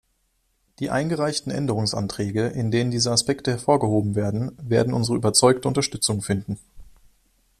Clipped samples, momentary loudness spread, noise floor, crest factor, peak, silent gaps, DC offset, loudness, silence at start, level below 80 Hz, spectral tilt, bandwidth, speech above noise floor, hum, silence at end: under 0.1%; 8 LU; -69 dBFS; 22 dB; -2 dBFS; none; under 0.1%; -22 LUFS; 0.8 s; -52 dBFS; -4.5 dB/octave; 14 kHz; 47 dB; none; 0.7 s